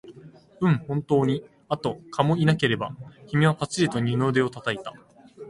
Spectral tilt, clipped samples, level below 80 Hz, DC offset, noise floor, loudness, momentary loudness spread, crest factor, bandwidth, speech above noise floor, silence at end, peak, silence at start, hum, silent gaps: -6.5 dB/octave; under 0.1%; -58 dBFS; under 0.1%; -48 dBFS; -25 LUFS; 10 LU; 20 dB; 11.5 kHz; 25 dB; 0 s; -4 dBFS; 0.05 s; none; none